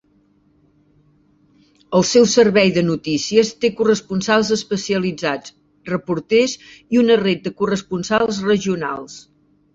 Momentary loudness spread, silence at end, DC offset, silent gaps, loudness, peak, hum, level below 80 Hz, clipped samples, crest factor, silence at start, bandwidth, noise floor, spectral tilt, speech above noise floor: 12 LU; 0.55 s; under 0.1%; none; -18 LUFS; -2 dBFS; none; -56 dBFS; under 0.1%; 18 dB; 1.9 s; 7.8 kHz; -58 dBFS; -4.5 dB/octave; 40 dB